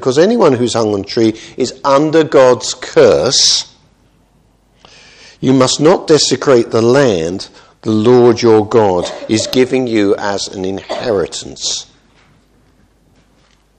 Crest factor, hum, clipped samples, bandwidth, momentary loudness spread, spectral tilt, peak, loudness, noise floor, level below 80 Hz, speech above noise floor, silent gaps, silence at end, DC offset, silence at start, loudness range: 12 dB; none; 0.2%; 13 kHz; 11 LU; -4 dB/octave; 0 dBFS; -12 LUFS; -52 dBFS; -48 dBFS; 41 dB; none; 1.95 s; under 0.1%; 0 s; 6 LU